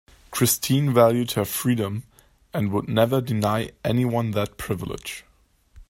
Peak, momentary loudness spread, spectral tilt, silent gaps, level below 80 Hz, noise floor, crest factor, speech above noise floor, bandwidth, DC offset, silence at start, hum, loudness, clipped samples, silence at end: -4 dBFS; 14 LU; -5.5 dB/octave; none; -52 dBFS; -56 dBFS; 20 dB; 33 dB; 16.5 kHz; under 0.1%; 0.3 s; none; -23 LUFS; under 0.1%; 0.05 s